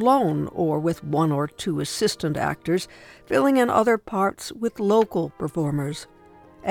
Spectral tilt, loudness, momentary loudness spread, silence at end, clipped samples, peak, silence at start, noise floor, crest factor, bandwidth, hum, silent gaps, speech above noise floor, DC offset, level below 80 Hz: -6 dB/octave; -23 LUFS; 9 LU; 0 s; under 0.1%; -6 dBFS; 0 s; -48 dBFS; 18 dB; 18 kHz; none; none; 25 dB; under 0.1%; -56 dBFS